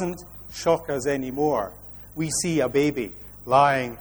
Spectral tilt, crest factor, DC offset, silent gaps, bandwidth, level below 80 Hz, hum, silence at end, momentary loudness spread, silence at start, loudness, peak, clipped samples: -4.5 dB/octave; 18 dB; under 0.1%; none; over 20 kHz; -50 dBFS; 50 Hz at -45 dBFS; 0 s; 18 LU; 0 s; -24 LUFS; -6 dBFS; under 0.1%